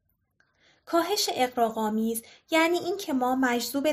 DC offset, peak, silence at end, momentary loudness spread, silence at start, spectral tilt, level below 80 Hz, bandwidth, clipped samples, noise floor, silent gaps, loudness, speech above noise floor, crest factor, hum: under 0.1%; -10 dBFS; 0 s; 5 LU; 0.9 s; -3 dB/octave; -68 dBFS; 15.5 kHz; under 0.1%; -70 dBFS; none; -26 LUFS; 44 dB; 16 dB; none